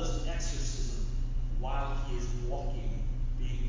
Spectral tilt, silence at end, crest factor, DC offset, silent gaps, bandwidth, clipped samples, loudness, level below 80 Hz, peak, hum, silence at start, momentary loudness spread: -5 dB/octave; 0 s; 10 dB; under 0.1%; none; 7.6 kHz; under 0.1%; -37 LUFS; -32 dBFS; -20 dBFS; none; 0 s; 2 LU